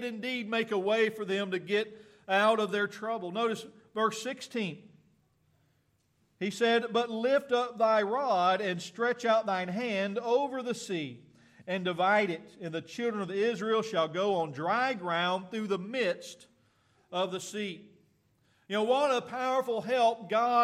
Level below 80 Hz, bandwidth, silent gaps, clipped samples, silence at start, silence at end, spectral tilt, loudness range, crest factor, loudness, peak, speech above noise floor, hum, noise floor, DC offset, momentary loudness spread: -82 dBFS; 14.5 kHz; none; under 0.1%; 0 s; 0 s; -4.5 dB/octave; 6 LU; 18 dB; -30 LUFS; -14 dBFS; 42 dB; none; -72 dBFS; under 0.1%; 11 LU